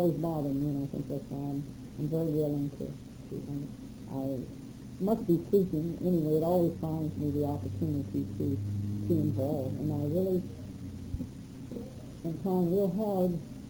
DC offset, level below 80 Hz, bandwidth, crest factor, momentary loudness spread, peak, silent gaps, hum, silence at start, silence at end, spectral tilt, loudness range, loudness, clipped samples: under 0.1%; -54 dBFS; over 20 kHz; 16 dB; 14 LU; -14 dBFS; none; none; 0 s; 0 s; -9.5 dB/octave; 5 LU; -32 LUFS; under 0.1%